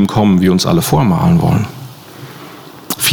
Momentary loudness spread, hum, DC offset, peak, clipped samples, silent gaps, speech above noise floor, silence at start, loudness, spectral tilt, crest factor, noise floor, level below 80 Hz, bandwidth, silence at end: 22 LU; none; under 0.1%; -2 dBFS; under 0.1%; none; 22 dB; 0 s; -12 LUFS; -5.5 dB/octave; 10 dB; -34 dBFS; -40 dBFS; over 20 kHz; 0 s